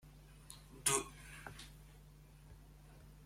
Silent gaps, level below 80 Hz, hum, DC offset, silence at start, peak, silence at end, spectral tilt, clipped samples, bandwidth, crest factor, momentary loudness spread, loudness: none; -62 dBFS; none; under 0.1%; 0 s; -18 dBFS; 0 s; -1.5 dB/octave; under 0.1%; 16.5 kHz; 30 dB; 26 LU; -39 LUFS